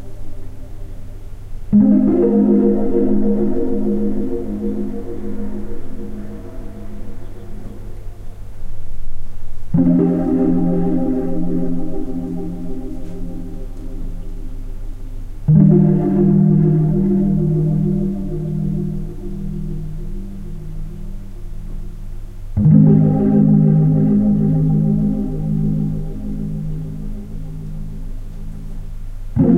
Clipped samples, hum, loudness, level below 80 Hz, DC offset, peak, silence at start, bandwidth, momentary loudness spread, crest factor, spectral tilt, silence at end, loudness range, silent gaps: under 0.1%; none; -17 LUFS; -28 dBFS; under 0.1%; 0 dBFS; 0 s; 3 kHz; 22 LU; 16 dB; -11.5 dB/octave; 0 s; 16 LU; none